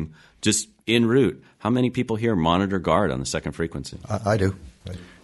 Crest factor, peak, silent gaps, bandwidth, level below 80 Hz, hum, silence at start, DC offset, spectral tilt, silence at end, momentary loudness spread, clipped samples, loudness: 20 dB; -4 dBFS; none; 11.5 kHz; -46 dBFS; none; 0 s; under 0.1%; -5 dB/octave; 0.2 s; 15 LU; under 0.1%; -23 LUFS